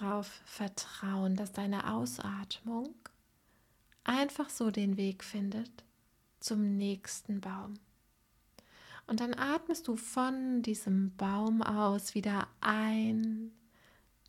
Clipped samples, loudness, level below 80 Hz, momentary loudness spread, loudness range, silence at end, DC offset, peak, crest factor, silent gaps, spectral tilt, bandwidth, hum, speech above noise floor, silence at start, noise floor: under 0.1%; -35 LUFS; -70 dBFS; 10 LU; 6 LU; 0.75 s; under 0.1%; -14 dBFS; 22 dB; none; -5 dB/octave; 15.5 kHz; none; 37 dB; 0 s; -71 dBFS